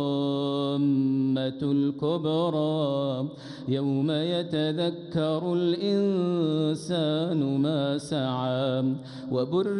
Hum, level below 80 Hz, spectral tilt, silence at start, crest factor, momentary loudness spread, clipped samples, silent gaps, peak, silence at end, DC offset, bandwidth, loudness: none; -68 dBFS; -7.5 dB/octave; 0 s; 12 dB; 4 LU; under 0.1%; none; -14 dBFS; 0 s; under 0.1%; 11 kHz; -27 LUFS